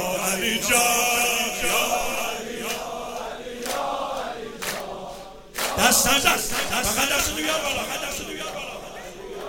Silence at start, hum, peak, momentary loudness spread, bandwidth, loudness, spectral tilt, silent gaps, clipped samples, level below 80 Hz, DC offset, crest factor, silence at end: 0 s; none; -2 dBFS; 16 LU; 17 kHz; -22 LUFS; -1 dB/octave; none; under 0.1%; -44 dBFS; under 0.1%; 22 dB; 0 s